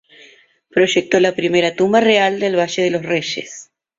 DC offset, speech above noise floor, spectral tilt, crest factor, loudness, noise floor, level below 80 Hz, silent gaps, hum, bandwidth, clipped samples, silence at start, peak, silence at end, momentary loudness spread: under 0.1%; 33 dB; -4 dB/octave; 16 dB; -16 LUFS; -49 dBFS; -60 dBFS; none; none; 7.8 kHz; under 0.1%; 0.75 s; -2 dBFS; 0.35 s; 11 LU